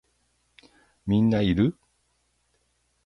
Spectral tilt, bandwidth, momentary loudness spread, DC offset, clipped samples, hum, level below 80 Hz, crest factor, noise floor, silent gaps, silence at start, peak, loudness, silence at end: -8.5 dB/octave; 6 kHz; 6 LU; under 0.1%; under 0.1%; none; -48 dBFS; 18 dB; -71 dBFS; none; 1.05 s; -10 dBFS; -24 LUFS; 1.35 s